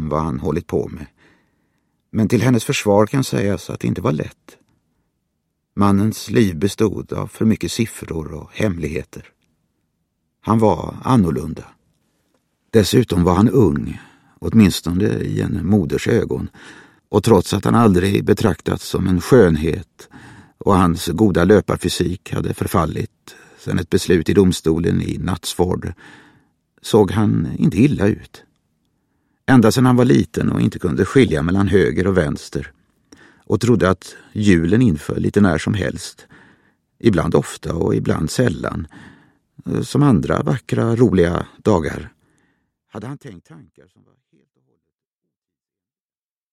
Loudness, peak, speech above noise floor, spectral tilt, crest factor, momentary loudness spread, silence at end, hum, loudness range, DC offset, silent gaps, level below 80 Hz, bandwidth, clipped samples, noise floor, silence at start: -17 LUFS; 0 dBFS; over 73 dB; -6.5 dB/octave; 18 dB; 14 LU; 2.95 s; none; 5 LU; under 0.1%; none; -40 dBFS; 15.5 kHz; under 0.1%; under -90 dBFS; 0 s